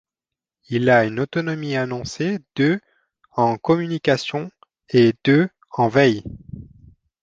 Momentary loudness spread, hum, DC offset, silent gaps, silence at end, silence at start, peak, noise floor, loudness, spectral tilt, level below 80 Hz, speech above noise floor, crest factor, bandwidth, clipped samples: 13 LU; none; under 0.1%; none; 0.6 s; 0.7 s; -2 dBFS; -88 dBFS; -20 LUFS; -6.5 dB/octave; -54 dBFS; 69 dB; 18 dB; 7.8 kHz; under 0.1%